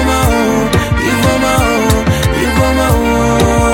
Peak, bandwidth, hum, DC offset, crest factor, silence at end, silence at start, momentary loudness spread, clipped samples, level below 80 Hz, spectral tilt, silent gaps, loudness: 0 dBFS; 17 kHz; none; under 0.1%; 10 dB; 0 s; 0 s; 2 LU; under 0.1%; -20 dBFS; -5 dB/octave; none; -11 LUFS